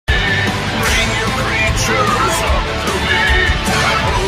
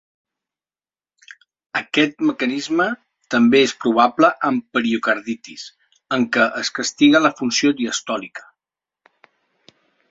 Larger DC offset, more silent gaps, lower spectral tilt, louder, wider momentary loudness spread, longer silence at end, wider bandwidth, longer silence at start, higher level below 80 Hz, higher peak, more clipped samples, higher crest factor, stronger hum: neither; neither; about the same, -3.5 dB/octave vs -3.5 dB/octave; first, -14 LUFS vs -18 LUFS; second, 4 LU vs 15 LU; second, 0 s vs 1.7 s; first, 16 kHz vs 7.8 kHz; second, 0.1 s vs 1.75 s; first, -22 dBFS vs -64 dBFS; about the same, -2 dBFS vs -2 dBFS; neither; second, 12 dB vs 18 dB; neither